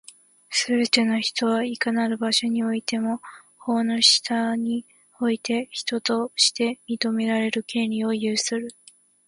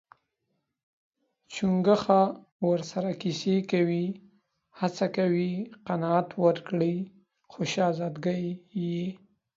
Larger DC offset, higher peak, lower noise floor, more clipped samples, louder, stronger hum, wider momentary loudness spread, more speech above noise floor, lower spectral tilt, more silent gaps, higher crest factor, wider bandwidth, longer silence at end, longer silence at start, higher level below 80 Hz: neither; first, -4 dBFS vs -8 dBFS; second, -46 dBFS vs -79 dBFS; neither; first, -23 LUFS vs -28 LUFS; neither; second, 8 LU vs 11 LU; second, 23 dB vs 52 dB; second, -2.5 dB/octave vs -7 dB/octave; second, none vs 2.52-2.59 s; about the same, 20 dB vs 22 dB; first, 11.5 kHz vs 7.8 kHz; first, 0.55 s vs 0.4 s; second, 0.5 s vs 1.5 s; about the same, -72 dBFS vs -70 dBFS